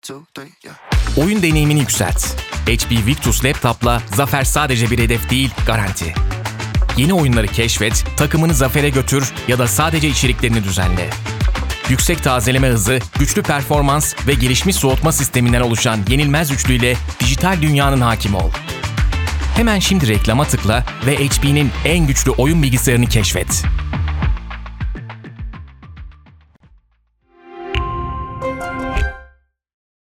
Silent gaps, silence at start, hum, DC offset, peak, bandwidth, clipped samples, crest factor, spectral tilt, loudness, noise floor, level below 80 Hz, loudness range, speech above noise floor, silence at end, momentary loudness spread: none; 0.05 s; none; under 0.1%; 0 dBFS; 18.5 kHz; under 0.1%; 16 dB; -4.5 dB/octave; -16 LUFS; -60 dBFS; -24 dBFS; 11 LU; 45 dB; 0.85 s; 9 LU